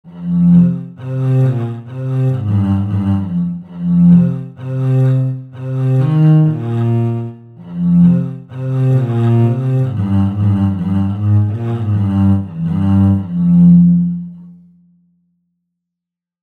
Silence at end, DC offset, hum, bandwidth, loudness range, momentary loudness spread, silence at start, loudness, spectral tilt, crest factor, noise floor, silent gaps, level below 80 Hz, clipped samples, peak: 1.9 s; under 0.1%; none; 3.9 kHz; 2 LU; 13 LU; 0.05 s; -14 LUFS; -11 dB/octave; 14 dB; -83 dBFS; none; -48 dBFS; under 0.1%; 0 dBFS